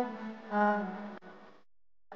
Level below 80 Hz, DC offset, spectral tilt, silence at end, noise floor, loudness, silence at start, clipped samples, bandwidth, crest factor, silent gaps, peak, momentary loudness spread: -84 dBFS; 0.1%; -5 dB/octave; 0 s; -55 dBFS; -33 LUFS; 0 s; under 0.1%; 6.6 kHz; 20 dB; none; -16 dBFS; 20 LU